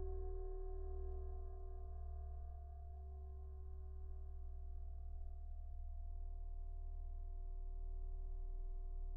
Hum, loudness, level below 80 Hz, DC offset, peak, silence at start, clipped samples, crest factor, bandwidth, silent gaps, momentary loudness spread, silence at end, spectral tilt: none; -53 LUFS; -46 dBFS; under 0.1%; -36 dBFS; 0 s; under 0.1%; 12 dB; 1.6 kHz; none; 4 LU; 0 s; -7 dB/octave